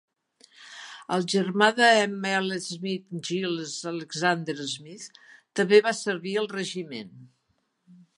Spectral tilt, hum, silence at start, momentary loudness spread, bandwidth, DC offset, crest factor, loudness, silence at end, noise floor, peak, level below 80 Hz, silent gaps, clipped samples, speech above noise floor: -4 dB/octave; none; 0.6 s; 22 LU; 11.5 kHz; under 0.1%; 22 dB; -25 LUFS; 0.25 s; -73 dBFS; -4 dBFS; -80 dBFS; none; under 0.1%; 48 dB